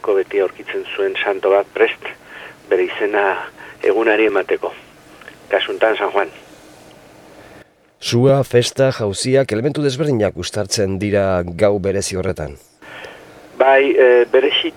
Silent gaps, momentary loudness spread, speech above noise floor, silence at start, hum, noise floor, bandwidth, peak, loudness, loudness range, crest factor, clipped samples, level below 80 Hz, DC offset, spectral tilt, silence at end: none; 15 LU; 30 dB; 0.05 s; none; -46 dBFS; 15 kHz; 0 dBFS; -17 LUFS; 4 LU; 16 dB; under 0.1%; -50 dBFS; under 0.1%; -5 dB/octave; 0.05 s